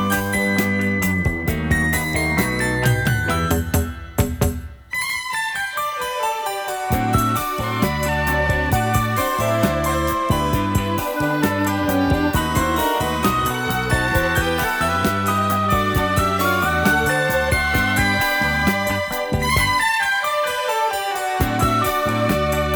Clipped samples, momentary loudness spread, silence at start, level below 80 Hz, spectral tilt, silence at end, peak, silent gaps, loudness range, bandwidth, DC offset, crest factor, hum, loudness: under 0.1%; 5 LU; 0 s; -34 dBFS; -5 dB/octave; 0 s; -2 dBFS; none; 4 LU; over 20 kHz; under 0.1%; 16 dB; none; -19 LUFS